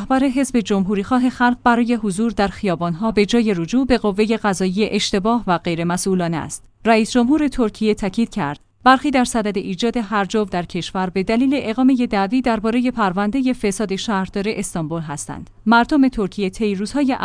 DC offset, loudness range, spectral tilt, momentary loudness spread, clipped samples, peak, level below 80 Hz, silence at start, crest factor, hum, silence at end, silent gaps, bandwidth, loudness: under 0.1%; 2 LU; -5 dB/octave; 7 LU; under 0.1%; 0 dBFS; -42 dBFS; 0 s; 18 dB; none; 0 s; none; 10.5 kHz; -19 LUFS